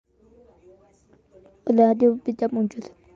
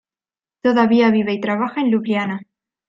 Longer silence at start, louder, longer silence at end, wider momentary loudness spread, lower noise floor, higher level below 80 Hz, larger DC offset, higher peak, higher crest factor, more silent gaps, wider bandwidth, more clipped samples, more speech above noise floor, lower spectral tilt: first, 1.65 s vs 0.65 s; second, -22 LUFS vs -18 LUFS; second, 0.3 s vs 0.45 s; first, 14 LU vs 8 LU; second, -58 dBFS vs under -90 dBFS; about the same, -64 dBFS vs -64 dBFS; neither; second, -6 dBFS vs -2 dBFS; about the same, 18 dB vs 16 dB; neither; first, 7.2 kHz vs 6.2 kHz; neither; second, 38 dB vs over 73 dB; about the same, -8.5 dB/octave vs -7.5 dB/octave